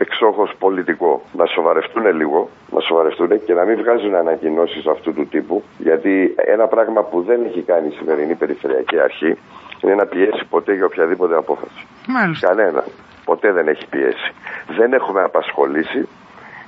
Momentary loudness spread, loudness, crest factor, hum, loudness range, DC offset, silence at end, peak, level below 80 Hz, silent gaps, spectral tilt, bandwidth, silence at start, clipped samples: 7 LU; -17 LUFS; 16 dB; none; 2 LU; under 0.1%; 0 s; 0 dBFS; -66 dBFS; none; -7.5 dB/octave; 5.4 kHz; 0 s; under 0.1%